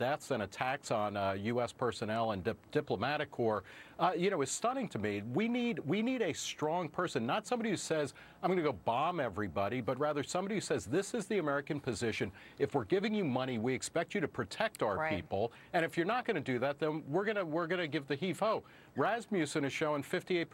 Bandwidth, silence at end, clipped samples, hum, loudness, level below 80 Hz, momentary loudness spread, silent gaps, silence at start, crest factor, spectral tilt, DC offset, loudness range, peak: 16 kHz; 0.05 s; under 0.1%; none; -35 LUFS; -70 dBFS; 4 LU; none; 0 s; 18 dB; -5 dB/octave; under 0.1%; 1 LU; -16 dBFS